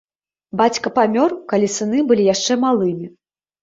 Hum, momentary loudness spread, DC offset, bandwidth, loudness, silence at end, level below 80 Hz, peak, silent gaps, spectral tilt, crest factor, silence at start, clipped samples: none; 9 LU; under 0.1%; 7.8 kHz; -17 LUFS; 0.55 s; -60 dBFS; -2 dBFS; none; -4.5 dB/octave; 16 dB; 0.55 s; under 0.1%